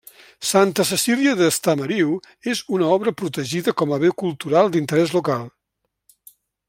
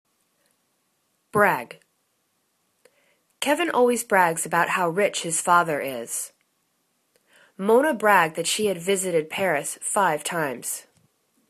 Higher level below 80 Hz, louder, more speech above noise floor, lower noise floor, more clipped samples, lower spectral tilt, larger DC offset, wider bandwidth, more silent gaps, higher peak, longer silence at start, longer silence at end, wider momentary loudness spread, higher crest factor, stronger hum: first, -64 dBFS vs -72 dBFS; about the same, -20 LUFS vs -22 LUFS; first, 58 dB vs 49 dB; first, -77 dBFS vs -71 dBFS; neither; first, -4.5 dB/octave vs -3 dB/octave; neither; first, 16.5 kHz vs 14 kHz; neither; about the same, -2 dBFS vs -4 dBFS; second, 0.4 s vs 1.35 s; first, 1.2 s vs 0.7 s; about the same, 9 LU vs 10 LU; about the same, 18 dB vs 22 dB; neither